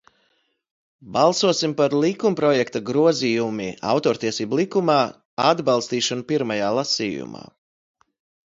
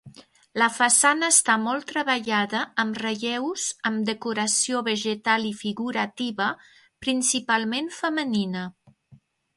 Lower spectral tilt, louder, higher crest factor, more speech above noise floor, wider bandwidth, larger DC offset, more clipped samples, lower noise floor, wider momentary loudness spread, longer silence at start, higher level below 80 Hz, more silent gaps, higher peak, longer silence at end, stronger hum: first, -4.5 dB/octave vs -2 dB/octave; about the same, -21 LUFS vs -23 LUFS; about the same, 20 dB vs 22 dB; first, 47 dB vs 32 dB; second, 7.8 kHz vs 12 kHz; neither; neither; first, -67 dBFS vs -56 dBFS; second, 8 LU vs 11 LU; first, 1.05 s vs 0.05 s; first, -64 dBFS vs -70 dBFS; first, 5.25-5.37 s vs none; about the same, -2 dBFS vs -4 dBFS; first, 1.05 s vs 0.4 s; neither